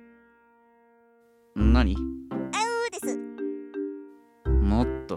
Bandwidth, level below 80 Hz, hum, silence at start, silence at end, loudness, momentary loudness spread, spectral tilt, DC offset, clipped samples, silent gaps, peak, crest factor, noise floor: 12.5 kHz; -30 dBFS; none; 1.55 s; 0 s; -27 LUFS; 13 LU; -6 dB/octave; under 0.1%; under 0.1%; none; -8 dBFS; 20 dB; -60 dBFS